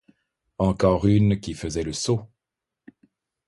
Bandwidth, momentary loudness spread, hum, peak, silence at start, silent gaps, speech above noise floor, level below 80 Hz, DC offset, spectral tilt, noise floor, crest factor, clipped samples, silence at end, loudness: 11.5 kHz; 9 LU; none; -4 dBFS; 0.6 s; none; 65 dB; -42 dBFS; under 0.1%; -6.5 dB/octave; -86 dBFS; 20 dB; under 0.1%; 1.2 s; -23 LUFS